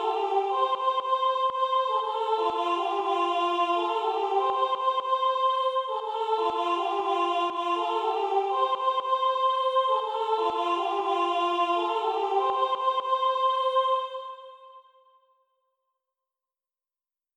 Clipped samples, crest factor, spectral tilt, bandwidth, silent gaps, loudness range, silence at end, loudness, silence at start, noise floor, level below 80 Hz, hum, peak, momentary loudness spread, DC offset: under 0.1%; 14 dB; -2.5 dB/octave; 10 kHz; none; 2 LU; 2.55 s; -26 LUFS; 0 s; under -90 dBFS; -78 dBFS; none; -14 dBFS; 3 LU; under 0.1%